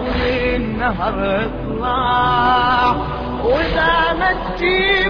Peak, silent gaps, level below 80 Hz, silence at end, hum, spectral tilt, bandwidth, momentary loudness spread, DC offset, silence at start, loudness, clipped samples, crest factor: -4 dBFS; none; -30 dBFS; 0 s; none; -7 dB/octave; 5.4 kHz; 7 LU; 0.3%; 0 s; -17 LUFS; under 0.1%; 14 dB